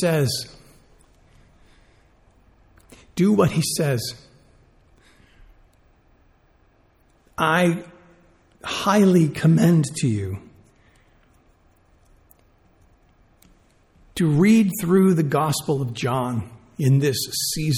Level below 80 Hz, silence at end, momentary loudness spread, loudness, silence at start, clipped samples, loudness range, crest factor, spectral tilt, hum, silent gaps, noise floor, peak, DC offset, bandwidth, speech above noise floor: -54 dBFS; 0 s; 16 LU; -20 LUFS; 0 s; under 0.1%; 10 LU; 18 dB; -5.5 dB/octave; none; none; -59 dBFS; -6 dBFS; under 0.1%; 16.5 kHz; 39 dB